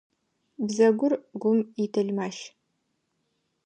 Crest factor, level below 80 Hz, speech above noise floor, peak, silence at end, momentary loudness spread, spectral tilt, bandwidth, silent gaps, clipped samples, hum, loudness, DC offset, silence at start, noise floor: 18 dB; -82 dBFS; 51 dB; -8 dBFS; 1.15 s; 13 LU; -6 dB/octave; 9.4 kHz; none; under 0.1%; none; -26 LUFS; under 0.1%; 0.6 s; -76 dBFS